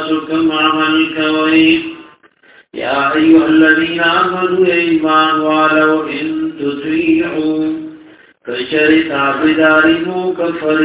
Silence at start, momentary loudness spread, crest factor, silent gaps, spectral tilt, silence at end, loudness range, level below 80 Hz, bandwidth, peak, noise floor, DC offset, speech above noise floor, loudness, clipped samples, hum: 0 s; 10 LU; 12 dB; none; -8.5 dB/octave; 0 s; 4 LU; -50 dBFS; 4 kHz; 0 dBFS; -46 dBFS; under 0.1%; 34 dB; -12 LUFS; under 0.1%; none